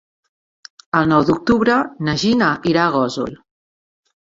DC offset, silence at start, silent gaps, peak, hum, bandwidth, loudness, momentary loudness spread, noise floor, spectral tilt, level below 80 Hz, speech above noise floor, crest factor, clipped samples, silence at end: under 0.1%; 0.95 s; none; -2 dBFS; none; 7.8 kHz; -17 LUFS; 6 LU; under -90 dBFS; -6 dB/octave; -50 dBFS; over 74 dB; 18 dB; under 0.1%; 1 s